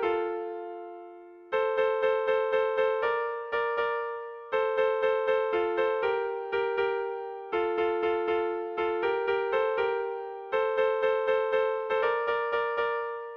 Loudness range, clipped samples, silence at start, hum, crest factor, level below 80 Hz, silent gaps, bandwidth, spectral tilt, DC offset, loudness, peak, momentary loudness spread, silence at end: 1 LU; under 0.1%; 0 s; none; 12 dB; -68 dBFS; none; 5.4 kHz; -5.5 dB/octave; under 0.1%; -28 LUFS; -16 dBFS; 9 LU; 0 s